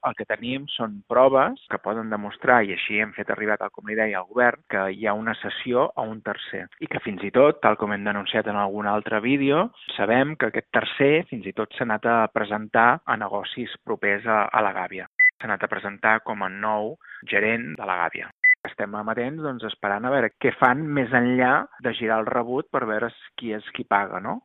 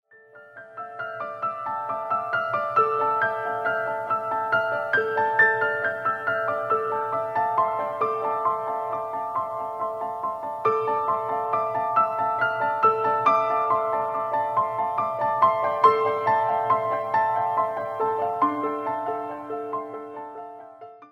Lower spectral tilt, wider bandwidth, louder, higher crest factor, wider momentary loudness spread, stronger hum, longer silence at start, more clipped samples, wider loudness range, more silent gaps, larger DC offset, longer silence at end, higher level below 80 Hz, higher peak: second, -3 dB/octave vs -6 dB/octave; second, 4.1 kHz vs 15.5 kHz; about the same, -23 LUFS vs -24 LUFS; about the same, 22 dB vs 20 dB; about the same, 11 LU vs 11 LU; neither; second, 0.05 s vs 0.35 s; neither; about the same, 2 LU vs 4 LU; first, 15.07-15.15 s, 15.33-15.38 s, 18.32-18.38 s, 18.57-18.63 s vs none; neither; about the same, 0.05 s vs 0.05 s; first, -66 dBFS vs -72 dBFS; about the same, -2 dBFS vs -4 dBFS